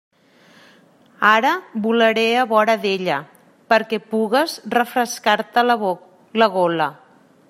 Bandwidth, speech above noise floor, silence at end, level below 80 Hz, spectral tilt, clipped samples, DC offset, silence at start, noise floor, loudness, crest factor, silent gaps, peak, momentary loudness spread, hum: 16 kHz; 34 dB; 0.55 s; -70 dBFS; -4 dB/octave; under 0.1%; under 0.1%; 1.2 s; -52 dBFS; -18 LUFS; 18 dB; none; -2 dBFS; 8 LU; none